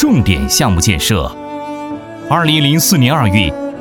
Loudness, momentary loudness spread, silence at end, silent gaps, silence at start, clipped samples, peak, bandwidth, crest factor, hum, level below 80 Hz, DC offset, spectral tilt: -12 LUFS; 14 LU; 0 s; none; 0 s; under 0.1%; 0 dBFS; 19.5 kHz; 12 dB; none; -28 dBFS; under 0.1%; -4 dB/octave